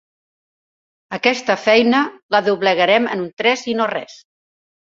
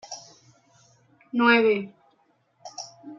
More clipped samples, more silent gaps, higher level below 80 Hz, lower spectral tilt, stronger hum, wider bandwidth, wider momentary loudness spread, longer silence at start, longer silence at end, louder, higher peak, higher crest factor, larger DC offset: neither; first, 2.23-2.29 s, 3.33-3.37 s vs none; first, -64 dBFS vs -80 dBFS; about the same, -4 dB/octave vs -4 dB/octave; neither; about the same, 7.8 kHz vs 7.4 kHz; second, 8 LU vs 23 LU; first, 1.1 s vs 0.1 s; first, 0.75 s vs 0.05 s; first, -17 LUFS vs -21 LUFS; first, 0 dBFS vs -6 dBFS; about the same, 18 dB vs 22 dB; neither